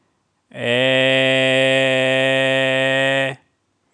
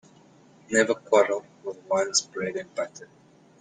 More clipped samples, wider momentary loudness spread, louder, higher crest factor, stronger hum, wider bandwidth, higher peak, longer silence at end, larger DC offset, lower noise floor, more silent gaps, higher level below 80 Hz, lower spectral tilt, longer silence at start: neither; second, 6 LU vs 13 LU; first, -16 LUFS vs -25 LUFS; second, 16 dB vs 22 dB; neither; about the same, 10.5 kHz vs 9.6 kHz; first, -2 dBFS vs -6 dBFS; about the same, 0.6 s vs 0.55 s; neither; first, -66 dBFS vs -55 dBFS; neither; second, -78 dBFS vs -70 dBFS; first, -4 dB/octave vs -2 dB/octave; second, 0.55 s vs 0.7 s